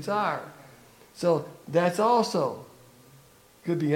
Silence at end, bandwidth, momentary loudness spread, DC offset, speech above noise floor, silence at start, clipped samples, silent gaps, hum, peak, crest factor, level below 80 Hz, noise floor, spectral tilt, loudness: 0 s; 17 kHz; 14 LU; under 0.1%; 30 dB; 0 s; under 0.1%; none; none; -10 dBFS; 18 dB; -70 dBFS; -56 dBFS; -6 dB/octave; -27 LUFS